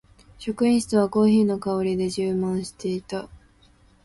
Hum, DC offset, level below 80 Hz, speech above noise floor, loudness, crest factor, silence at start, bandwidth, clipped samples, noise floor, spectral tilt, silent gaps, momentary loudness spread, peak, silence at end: none; under 0.1%; -54 dBFS; 34 dB; -23 LUFS; 14 dB; 0.4 s; 11.5 kHz; under 0.1%; -56 dBFS; -6.5 dB/octave; none; 14 LU; -8 dBFS; 0.7 s